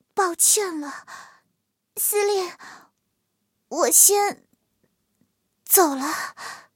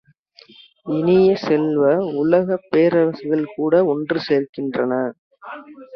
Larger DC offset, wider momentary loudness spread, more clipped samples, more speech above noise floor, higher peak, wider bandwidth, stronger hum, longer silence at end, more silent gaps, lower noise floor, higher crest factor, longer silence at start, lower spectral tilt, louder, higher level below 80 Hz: neither; first, 20 LU vs 13 LU; neither; first, 53 dB vs 32 dB; about the same, 0 dBFS vs -2 dBFS; first, 17 kHz vs 6.2 kHz; neither; first, 0.15 s vs 0 s; second, none vs 4.49-4.53 s, 5.19-5.31 s; first, -75 dBFS vs -50 dBFS; first, 24 dB vs 18 dB; second, 0.15 s vs 0.85 s; second, 0.5 dB/octave vs -8.5 dB/octave; about the same, -18 LUFS vs -18 LUFS; second, -84 dBFS vs -60 dBFS